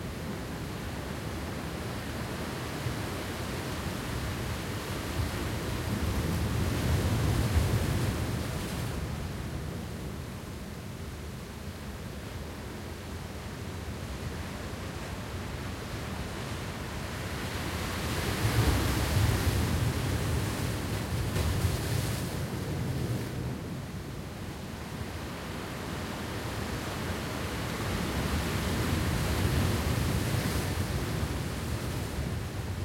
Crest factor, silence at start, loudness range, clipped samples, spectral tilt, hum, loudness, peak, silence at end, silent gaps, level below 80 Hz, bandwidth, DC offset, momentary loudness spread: 18 dB; 0 s; 9 LU; under 0.1%; -5 dB/octave; none; -33 LUFS; -14 dBFS; 0 s; none; -40 dBFS; 16.5 kHz; under 0.1%; 11 LU